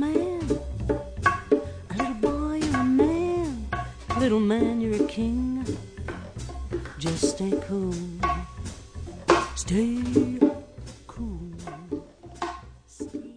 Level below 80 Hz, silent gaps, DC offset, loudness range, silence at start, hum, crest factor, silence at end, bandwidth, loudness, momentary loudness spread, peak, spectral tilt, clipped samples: -40 dBFS; none; under 0.1%; 5 LU; 0 s; none; 22 dB; 0 s; 10 kHz; -27 LUFS; 15 LU; -6 dBFS; -6 dB/octave; under 0.1%